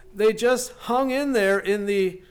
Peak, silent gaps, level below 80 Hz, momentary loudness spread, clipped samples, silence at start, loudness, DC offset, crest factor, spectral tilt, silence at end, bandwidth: -12 dBFS; none; -52 dBFS; 4 LU; under 0.1%; 0.15 s; -22 LUFS; under 0.1%; 10 dB; -4 dB/octave; 0.1 s; 19 kHz